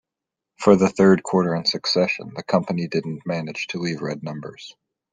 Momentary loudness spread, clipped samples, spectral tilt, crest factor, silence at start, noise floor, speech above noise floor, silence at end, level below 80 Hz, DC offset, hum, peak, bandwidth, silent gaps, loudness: 16 LU; under 0.1%; -5.5 dB/octave; 20 dB; 0.6 s; -86 dBFS; 65 dB; 0.4 s; -60 dBFS; under 0.1%; none; -2 dBFS; 9.4 kHz; none; -21 LUFS